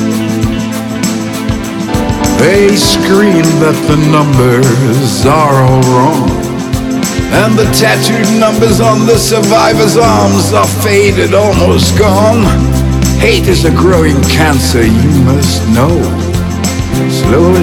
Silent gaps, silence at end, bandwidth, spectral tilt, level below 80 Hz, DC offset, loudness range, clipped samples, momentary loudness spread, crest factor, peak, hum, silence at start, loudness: none; 0 s; 18 kHz; -5.5 dB/octave; -22 dBFS; under 0.1%; 2 LU; 1%; 7 LU; 8 dB; 0 dBFS; none; 0 s; -8 LUFS